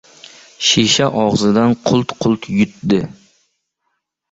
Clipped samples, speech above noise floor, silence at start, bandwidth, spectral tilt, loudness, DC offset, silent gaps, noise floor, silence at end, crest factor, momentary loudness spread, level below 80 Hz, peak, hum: under 0.1%; 57 dB; 0.6 s; 8.2 kHz; -4.5 dB/octave; -15 LUFS; under 0.1%; none; -71 dBFS; 1.2 s; 16 dB; 6 LU; -48 dBFS; 0 dBFS; none